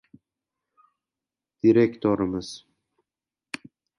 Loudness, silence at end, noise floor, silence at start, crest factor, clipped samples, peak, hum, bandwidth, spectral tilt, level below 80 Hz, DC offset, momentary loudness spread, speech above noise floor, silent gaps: -23 LUFS; 1.4 s; under -90 dBFS; 1.65 s; 20 dB; under 0.1%; -8 dBFS; none; 11.5 kHz; -7 dB/octave; -60 dBFS; under 0.1%; 20 LU; over 68 dB; none